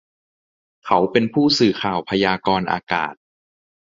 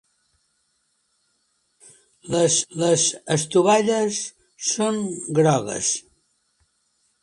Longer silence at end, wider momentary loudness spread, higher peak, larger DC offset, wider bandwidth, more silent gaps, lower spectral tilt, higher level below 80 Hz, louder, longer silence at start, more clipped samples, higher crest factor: second, 0.85 s vs 1.2 s; about the same, 7 LU vs 9 LU; about the same, -2 dBFS vs -4 dBFS; neither; second, 7.6 kHz vs 11.5 kHz; first, 2.83-2.87 s vs none; first, -5 dB/octave vs -3.5 dB/octave; first, -54 dBFS vs -64 dBFS; about the same, -19 LUFS vs -21 LUFS; second, 0.85 s vs 2.25 s; neither; about the same, 20 dB vs 20 dB